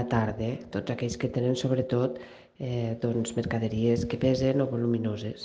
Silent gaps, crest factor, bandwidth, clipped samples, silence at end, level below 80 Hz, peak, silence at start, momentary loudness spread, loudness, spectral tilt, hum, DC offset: none; 16 dB; 9.4 kHz; under 0.1%; 0 s; -52 dBFS; -12 dBFS; 0 s; 7 LU; -28 LUFS; -7 dB/octave; none; under 0.1%